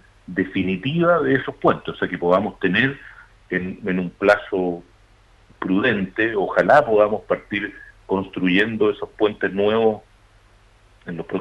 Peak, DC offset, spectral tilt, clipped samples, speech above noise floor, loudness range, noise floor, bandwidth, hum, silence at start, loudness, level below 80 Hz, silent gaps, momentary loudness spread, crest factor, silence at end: -4 dBFS; under 0.1%; -7.5 dB/octave; under 0.1%; 33 dB; 3 LU; -53 dBFS; 9.6 kHz; none; 0.3 s; -20 LUFS; -52 dBFS; none; 10 LU; 18 dB; 0 s